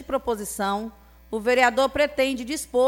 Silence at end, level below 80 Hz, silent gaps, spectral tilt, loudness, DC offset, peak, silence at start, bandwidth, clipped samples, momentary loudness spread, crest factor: 0 s; -50 dBFS; none; -3 dB/octave; -24 LUFS; under 0.1%; -6 dBFS; 0 s; 17 kHz; under 0.1%; 11 LU; 18 dB